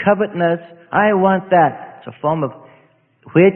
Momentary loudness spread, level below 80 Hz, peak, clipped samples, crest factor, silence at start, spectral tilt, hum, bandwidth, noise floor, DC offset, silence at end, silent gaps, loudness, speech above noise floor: 11 LU; -56 dBFS; 0 dBFS; under 0.1%; 16 dB; 0 s; -12.5 dB/octave; none; 3.5 kHz; -54 dBFS; under 0.1%; 0 s; none; -17 LUFS; 38 dB